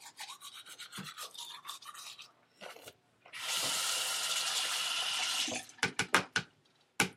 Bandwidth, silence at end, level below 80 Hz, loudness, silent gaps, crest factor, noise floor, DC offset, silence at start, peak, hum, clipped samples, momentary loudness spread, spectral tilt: 16 kHz; 0 s; -76 dBFS; -33 LUFS; none; 30 dB; -70 dBFS; under 0.1%; 0 s; -6 dBFS; none; under 0.1%; 19 LU; -0.5 dB/octave